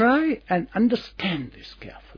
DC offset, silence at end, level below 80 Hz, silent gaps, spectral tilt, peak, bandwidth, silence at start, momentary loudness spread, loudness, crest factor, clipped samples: under 0.1%; 0.2 s; -52 dBFS; none; -7.5 dB/octave; -6 dBFS; 5.4 kHz; 0 s; 19 LU; -24 LUFS; 16 dB; under 0.1%